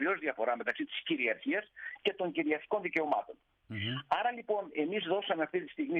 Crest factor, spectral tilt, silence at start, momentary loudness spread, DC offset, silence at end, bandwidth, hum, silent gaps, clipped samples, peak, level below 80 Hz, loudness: 18 dB; -7 dB/octave; 0 s; 5 LU; under 0.1%; 0 s; 7 kHz; none; none; under 0.1%; -16 dBFS; -78 dBFS; -34 LUFS